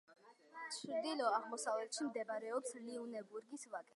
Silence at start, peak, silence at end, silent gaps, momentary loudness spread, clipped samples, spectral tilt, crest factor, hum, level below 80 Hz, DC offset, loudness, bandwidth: 0.1 s; -24 dBFS; 0.15 s; none; 12 LU; under 0.1%; -2 dB/octave; 20 dB; none; under -90 dBFS; under 0.1%; -43 LUFS; 11.5 kHz